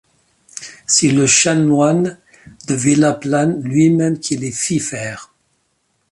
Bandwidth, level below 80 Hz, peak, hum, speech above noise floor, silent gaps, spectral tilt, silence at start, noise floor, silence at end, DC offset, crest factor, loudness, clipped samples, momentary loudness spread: 11.5 kHz; -56 dBFS; 0 dBFS; none; 50 dB; none; -4 dB/octave; 0.55 s; -65 dBFS; 0.85 s; under 0.1%; 16 dB; -15 LUFS; under 0.1%; 18 LU